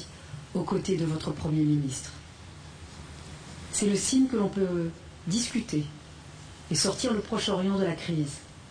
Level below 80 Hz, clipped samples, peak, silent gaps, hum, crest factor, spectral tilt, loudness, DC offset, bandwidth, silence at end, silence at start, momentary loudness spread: -52 dBFS; under 0.1%; -14 dBFS; none; none; 16 dB; -5 dB/octave; -28 LUFS; under 0.1%; 10.5 kHz; 0 s; 0 s; 20 LU